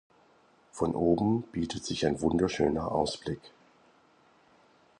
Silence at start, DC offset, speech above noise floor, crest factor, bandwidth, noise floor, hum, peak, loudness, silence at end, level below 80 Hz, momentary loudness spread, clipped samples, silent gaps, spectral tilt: 0.75 s; under 0.1%; 34 dB; 20 dB; 11 kHz; -63 dBFS; none; -12 dBFS; -30 LUFS; 1.5 s; -52 dBFS; 11 LU; under 0.1%; none; -6 dB/octave